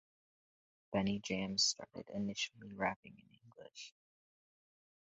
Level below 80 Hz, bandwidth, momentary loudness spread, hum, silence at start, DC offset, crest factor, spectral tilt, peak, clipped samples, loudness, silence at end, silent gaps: -70 dBFS; 7.6 kHz; 20 LU; none; 0.9 s; under 0.1%; 22 dB; -3 dB/octave; -20 dBFS; under 0.1%; -38 LUFS; 1.15 s; 2.96-3.03 s